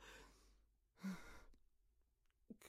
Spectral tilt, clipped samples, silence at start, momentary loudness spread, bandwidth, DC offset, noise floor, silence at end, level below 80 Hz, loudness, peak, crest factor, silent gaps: -5.5 dB/octave; under 0.1%; 0 s; 15 LU; 15.5 kHz; under 0.1%; -80 dBFS; 0 s; -72 dBFS; -56 LUFS; -40 dBFS; 20 dB; none